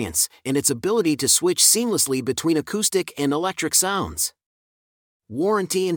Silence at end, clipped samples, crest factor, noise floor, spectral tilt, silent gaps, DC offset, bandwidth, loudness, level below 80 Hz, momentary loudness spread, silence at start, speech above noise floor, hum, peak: 0 s; under 0.1%; 20 dB; under -90 dBFS; -2.5 dB/octave; 4.46-5.20 s; under 0.1%; 19 kHz; -20 LUFS; -58 dBFS; 9 LU; 0 s; over 69 dB; none; -2 dBFS